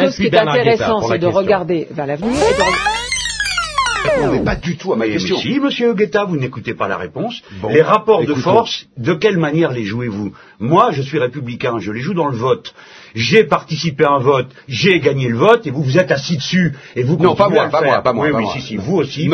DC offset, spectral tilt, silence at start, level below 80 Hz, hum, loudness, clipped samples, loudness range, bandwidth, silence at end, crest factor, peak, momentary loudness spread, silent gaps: under 0.1%; -5.5 dB/octave; 0 s; -42 dBFS; none; -15 LUFS; under 0.1%; 3 LU; 10.5 kHz; 0 s; 16 dB; 0 dBFS; 9 LU; none